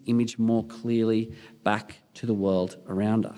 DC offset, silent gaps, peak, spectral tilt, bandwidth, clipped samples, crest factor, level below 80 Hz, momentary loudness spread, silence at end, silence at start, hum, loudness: under 0.1%; none; -6 dBFS; -7 dB/octave; 11 kHz; under 0.1%; 20 dB; -68 dBFS; 7 LU; 0 s; 0.05 s; none; -27 LUFS